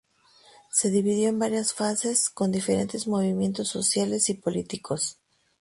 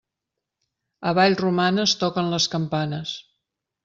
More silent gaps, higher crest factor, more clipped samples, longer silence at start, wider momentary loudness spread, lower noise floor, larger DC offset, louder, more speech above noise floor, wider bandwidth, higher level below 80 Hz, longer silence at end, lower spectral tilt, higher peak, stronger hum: neither; about the same, 18 dB vs 20 dB; neither; second, 0.75 s vs 1 s; second, 6 LU vs 11 LU; second, -58 dBFS vs -84 dBFS; neither; second, -25 LUFS vs -22 LUFS; second, 32 dB vs 62 dB; first, 11.5 kHz vs 7.8 kHz; about the same, -64 dBFS vs -62 dBFS; second, 0.5 s vs 0.65 s; about the same, -4 dB/octave vs -4.5 dB/octave; second, -10 dBFS vs -4 dBFS; neither